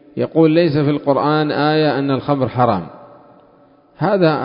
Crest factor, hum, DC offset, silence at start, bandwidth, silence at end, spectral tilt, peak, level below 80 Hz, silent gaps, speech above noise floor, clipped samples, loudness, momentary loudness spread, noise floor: 16 dB; none; under 0.1%; 0.15 s; 5.4 kHz; 0 s; -12.5 dB/octave; 0 dBFS; -52 dBFS; none; 35 dB; under 0.1%; -16 LUFS; 6 LU; -50 dBFS